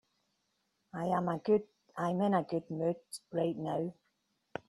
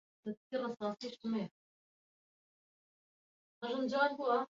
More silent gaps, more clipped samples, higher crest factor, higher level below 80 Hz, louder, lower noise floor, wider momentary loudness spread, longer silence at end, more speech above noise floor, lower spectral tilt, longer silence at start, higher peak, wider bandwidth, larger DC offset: second, none vs 0.37-0.50 s, 1.51-3.61 s; neither; about the same, 20 dB vs 20 dB; first, -74 dBFS vs -84 dBFS; first, -34 LUFS vs -38 LUFS; second, -80 dBFS vs under -90 dBFS; second, 11 LU vs 14 LU; first, 0.75 s vs 0.05 s; second, 47 dB vs over 53 dB; first, -7 dB/octave vs -3.5 dB/octave; first, 0.95 s vs 0.25 s; first, -16 dBFS vs -20 dBFS; first, 12.5 kHz vs 7.4 kHz; neither